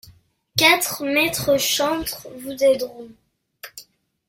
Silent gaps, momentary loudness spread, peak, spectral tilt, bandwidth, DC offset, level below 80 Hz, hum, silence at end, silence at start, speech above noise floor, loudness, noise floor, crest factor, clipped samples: none; 19 LU; -2 dBFS; -2 dB/octave; 16.5 kHz; under 0.1%; -54 dBFS; none; 0.45 s; 0.05 s; 33 dB; -19 LUFS; -53 dBFS; 22 dB; under 0.1%